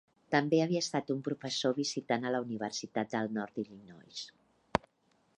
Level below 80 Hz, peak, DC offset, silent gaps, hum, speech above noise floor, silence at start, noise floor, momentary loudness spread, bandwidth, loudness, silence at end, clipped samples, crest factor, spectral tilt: -66 dBFS; -8 dBFS; under 0.1%; none; none; 39 dB; 0.3 s; -72 dBFS; 15 LU; 11 kHz; -34 LUFS; 0.6 s; under 0.1%; 28 dB; -4.5 dB/octave